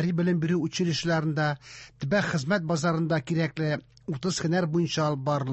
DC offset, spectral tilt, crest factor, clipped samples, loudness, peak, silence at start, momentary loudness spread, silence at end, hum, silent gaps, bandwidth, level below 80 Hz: under 0.1%; -6 dB/octave; 14 dB; under 0.1%; -27 LUFS; -14 dBFS; 0 s; 6 LU; 0 s; none; none; 8.4 kHz; -60 dBFS